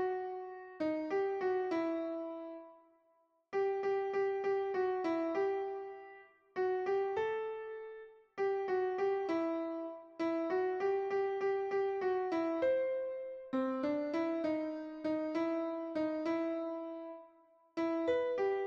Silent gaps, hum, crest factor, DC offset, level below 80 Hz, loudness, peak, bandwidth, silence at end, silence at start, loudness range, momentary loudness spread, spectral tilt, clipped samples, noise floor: none; none; 12 dB; under 0.1%; -78 dBFS; -36 LUFS; -24 dBFS; 6.8 kHz; 0 s; 0 s; 3 LU; 12 LU; -6 dB/octave; under 0.1%; -74 dBFS